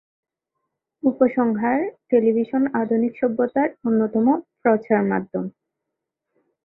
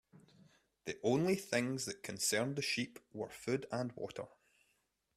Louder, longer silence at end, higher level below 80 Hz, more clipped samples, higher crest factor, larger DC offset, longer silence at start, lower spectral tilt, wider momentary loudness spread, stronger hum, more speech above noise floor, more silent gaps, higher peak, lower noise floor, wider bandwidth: first, -21 LUFS vs -38 LUFS; first, 1.15 s vs 0.9 s; first, -66 dBFS vs -76 dBFS; neither; about the same, 18 dB vs 20 dB; neither; first, 1.05 s vs 0.15 s; first, -12 dB/octave vs -4 dB/octave; second, 6 LU vs 13 LU; neither; first, 62 dB vs 42 dB; neither; first, -4 dBFS vs -20 dBFS; about the same, -82 dBFS vs -80 dBFS; second, 4.1 kHz vs 15.5 kHz